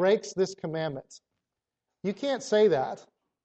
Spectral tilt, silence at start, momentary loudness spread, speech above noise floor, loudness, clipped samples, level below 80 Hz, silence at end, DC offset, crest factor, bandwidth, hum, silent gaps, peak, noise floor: -5 dB/octave; 0 s; 13 LU; 60 dB; -28 LUFS; under 0.1%; -72 dBFS; 0.45 s; under 0.1%; 18 dB; 8.4 kHz; none; none; -12 dBFS; -87 dBFS